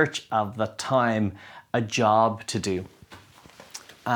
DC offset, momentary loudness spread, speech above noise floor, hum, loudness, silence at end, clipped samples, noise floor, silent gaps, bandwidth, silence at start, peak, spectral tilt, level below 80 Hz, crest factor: under 0.1%; 21 LU; 25 dB; none; -25 LUFS; 0 s; under 0.1%; -50 dBFS; none; 19.5 kHz; 0 s; -8 dBFS; -5 dB/octave; -64 dBFS; 18 dB